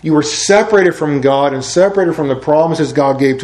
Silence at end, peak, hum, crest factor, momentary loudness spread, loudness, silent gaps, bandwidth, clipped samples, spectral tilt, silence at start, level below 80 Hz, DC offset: 0 s; 0 dBFS; none; 12 dB; 4 LU; -12 LUFS; none; 12 kHz; under 0.1%; -5 dB/octave; 0.05 s; -48 dBFS; under 0.1%